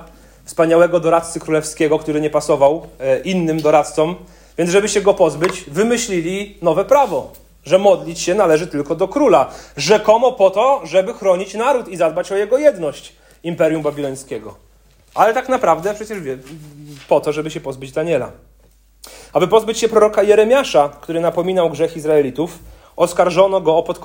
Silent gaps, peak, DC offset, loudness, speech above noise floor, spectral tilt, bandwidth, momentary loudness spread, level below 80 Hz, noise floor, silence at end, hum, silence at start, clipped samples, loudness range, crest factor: none; 0 dBFS; under 0.1%; -16 LUFS; 35 dB; -5 dB/octave; 16.5 kHz; 12 LU; -48 dBFS; -50 dBFS; 0 s; none; 0 s; under 0.1%; 5 LU; 16 dB